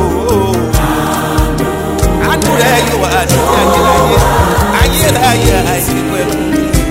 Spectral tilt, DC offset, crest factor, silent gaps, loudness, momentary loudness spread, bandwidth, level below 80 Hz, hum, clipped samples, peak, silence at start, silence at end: -4.5 dB/octave; under 0.1%; 10 dB; none; -11 LUFS; 5 LU; 16.5 kHz; -18 dBFS; none; under 0.1%; 0 dBFS; 0 s; 0 s